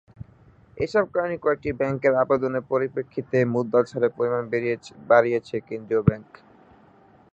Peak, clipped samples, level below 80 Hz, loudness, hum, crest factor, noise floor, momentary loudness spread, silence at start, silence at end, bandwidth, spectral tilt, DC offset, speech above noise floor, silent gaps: -2 dBFS; under 0.1%; -50 dBFS; -24 LUFS; none; 22 dB; -54 dBFS; 10 LU; 0.75 s; 1.1 s; 8.2 kHz; -8 dB/octave; under 0.1%; 31 dB; none